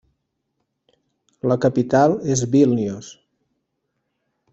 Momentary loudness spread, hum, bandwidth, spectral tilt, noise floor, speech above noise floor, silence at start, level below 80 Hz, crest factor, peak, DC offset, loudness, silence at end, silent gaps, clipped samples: 11 LU; none; 8.2 kHz; -6.5 dB/octave; -75 dBFS; 57 dB; 1.45 s; -58 dBFS; 20 dB; -2 dBFS; under 0.1%; -19 LUFS; 1.4 s; none; under 0.1%